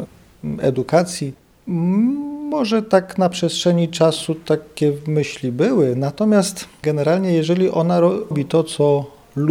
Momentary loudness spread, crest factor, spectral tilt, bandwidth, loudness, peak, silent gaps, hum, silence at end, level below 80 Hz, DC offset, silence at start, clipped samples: 8 LU; 16 dB; -6 dB/octave; 15.5 kHz; -18 LUFS; -2 dBFS; none; none; 0 s; -54 dBFS; under 0.1%; 0 s; under 0.1%